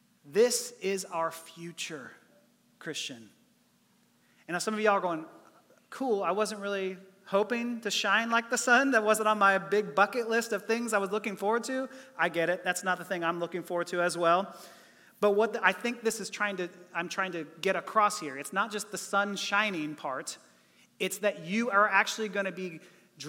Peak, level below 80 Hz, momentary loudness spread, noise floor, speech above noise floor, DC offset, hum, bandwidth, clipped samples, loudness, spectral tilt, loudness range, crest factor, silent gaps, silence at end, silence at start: -8 dBFS; -86 dBFS; 14 LU; -67 dBFS; 38 dB; under 0.1%; none; 17 kHz; under 0.1%; -29 LUFS; -3 dB/octave; 8 LU; 22 dB; none; 0 s; 0.25 s